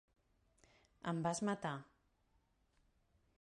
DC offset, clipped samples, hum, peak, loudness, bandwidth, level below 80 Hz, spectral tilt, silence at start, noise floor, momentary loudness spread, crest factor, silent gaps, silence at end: under 0.1%; under 0.1%; none; -26 dBFS; -42 LUFS; 11 kHz; -76 dBFS; -5 dB/octave; 1.05 s; -78 dBFS; 10 LU; 20 dB; none; 1.6 s